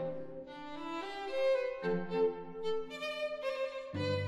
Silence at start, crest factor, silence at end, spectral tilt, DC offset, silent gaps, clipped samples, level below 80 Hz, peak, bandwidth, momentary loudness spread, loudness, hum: 0 s; 14 dB; 0 s; -6 dB/octave; under 0.1%; none; under 0.1%; -68 dBFS; -22 dBFS; 12.5 kHz; 12 LU; -37 LUFS; none